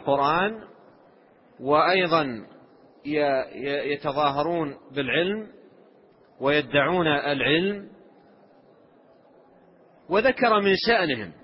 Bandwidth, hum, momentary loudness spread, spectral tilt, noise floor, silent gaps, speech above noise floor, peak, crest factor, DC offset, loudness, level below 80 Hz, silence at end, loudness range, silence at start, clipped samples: 5.8 kHz; none; 11 LU; -9.5 dB/octave; -56 dBFS; none; 33 dB; -6 dBFS; 18 dB; under 0.1%; -23 LUFS; -60 dBFS; 0.1 s; 3 LU; 0 s; under 0.1%